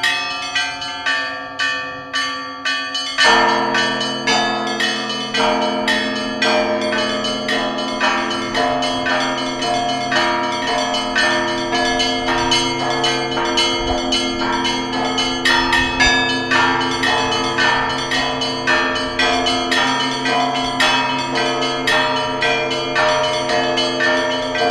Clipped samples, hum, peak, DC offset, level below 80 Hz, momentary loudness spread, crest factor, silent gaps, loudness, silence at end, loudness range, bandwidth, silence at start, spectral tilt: under 0.1%; none; 0 dBFS; under 0.1%; -40 dBFS; 5 LU; 18 dB; none; -17 LUFS; 0 s; 2 LU; 14.5 kHz; 0 s; -2.5 dB/octave